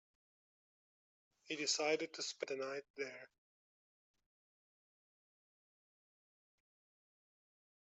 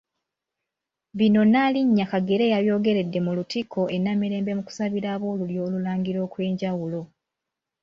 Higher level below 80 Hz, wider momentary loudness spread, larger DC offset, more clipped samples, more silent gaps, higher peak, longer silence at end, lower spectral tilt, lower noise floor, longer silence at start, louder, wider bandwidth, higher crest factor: second, under -90 dBFS vs -64 dBFS; about the same, 11 LU vs 9 LU; neither; neither; first, 2.90-2.94 s vs none; second, -24 dBFS vs -10 dBFS; first, 4.75 s vs 0.8 s; second, -0.5 dB/octave vs -7.5 dB/octave; first, under -90 dBFS vs -86 dBFS; first, 1.45 s vs 1.15 s; second, -41 LUFS vs -24 LUFS; about the same, 8 kHz vs 7.4 kHz; first, 24 dB vs 14 dB